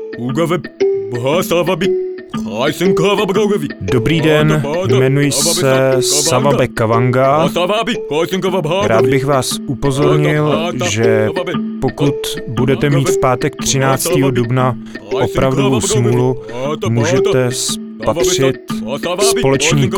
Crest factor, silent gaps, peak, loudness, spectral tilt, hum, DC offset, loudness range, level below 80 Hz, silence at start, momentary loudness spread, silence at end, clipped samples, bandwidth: 14 dB; none; 0 dBFS; -14 LUFS; -5 dB/octave; none; under 0.1%; 3 LU; -38 dBFS; 0 s; 7 LU; 0 s; under 0.1%; 20 kHz